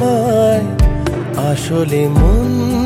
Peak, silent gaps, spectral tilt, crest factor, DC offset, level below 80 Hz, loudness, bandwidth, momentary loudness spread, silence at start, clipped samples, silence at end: 0 dBFS; none; -7 dB/octave; 12 dB; under 0.1%; -18 dBFS; -14 LUFS; 16 kHz; 5 LU; 0 s; under 0.1%; 0 s